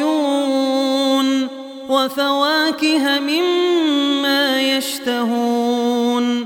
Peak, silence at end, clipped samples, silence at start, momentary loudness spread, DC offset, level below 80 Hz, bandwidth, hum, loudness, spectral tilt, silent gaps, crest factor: -2 dBFS; 0 s; under 0.1%; 0 s; 4 LU; under 0.1%; -68 dBFS; 17.5 kHz; none; -17 LUFS; -2.5 dB/octave; none; 14 dB